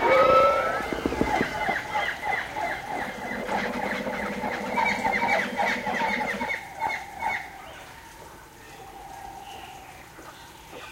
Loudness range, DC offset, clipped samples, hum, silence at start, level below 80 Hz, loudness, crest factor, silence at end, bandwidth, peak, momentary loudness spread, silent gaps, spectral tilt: 11 LU; under 0.1%; under 0.1%; none; 0 s; -50 dBFS; -26 LUFS; 20 dB; 0 s; 16 kHz; -8 dBFS; 20 LU; none; -4 dB/octave